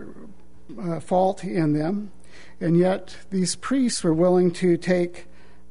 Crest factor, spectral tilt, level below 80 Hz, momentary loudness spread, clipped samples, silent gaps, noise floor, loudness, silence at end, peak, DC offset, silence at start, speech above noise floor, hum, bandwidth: 16 dB; -6 dB/octave; -56 dBFS; 12 LU; under 0.1%; none; -47 dBFS; -23 LUFS; 0.5 s; -8 dBFS; 2%; 0 s; 25 dB; none; 11 kHz